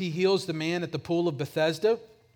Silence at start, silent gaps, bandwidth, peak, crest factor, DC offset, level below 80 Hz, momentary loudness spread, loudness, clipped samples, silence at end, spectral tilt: 0 s; none; 18.5 kHz; -14 dBFS; 14 dB; under 0.1%; -68 dBFS; 5 LU; -28 LUFS; under 0.1%; 0.3 s; -6 dB/octave